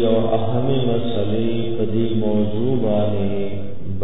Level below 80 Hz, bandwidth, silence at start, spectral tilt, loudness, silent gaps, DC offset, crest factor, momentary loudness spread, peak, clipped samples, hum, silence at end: -44 dBFS; 4 kHz; 0 s; -11.5 dB/octave; -21 LUFS; none; 10%; 14 dB; 5 LU; -4 dBFS; under 0.1%; none; 0 s